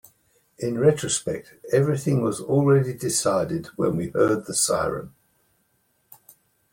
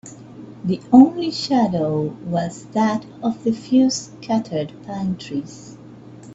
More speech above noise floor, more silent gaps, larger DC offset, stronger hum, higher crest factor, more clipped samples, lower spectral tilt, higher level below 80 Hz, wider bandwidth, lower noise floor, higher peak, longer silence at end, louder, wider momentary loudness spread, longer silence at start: first, 46 dB vs 21 dB; neither; neither; neither; about the same, 18 dB vs 20 dB; neither; about the same, -5 dB/octave vs -6 dB/octave; about the same, -56 dBFS vs -58 dBFS; first, 16.5 kHz vs 8 kHz; first, -68 dBFS vs -41 dBFS; second, -6 dBFS vs 0 dBFS; first, 1.65 s vs 0 s; second, -23 LUFS vs -20 LUFS; second, 9 LU vs 18 LU; first, 0.6 s vs 0.05 s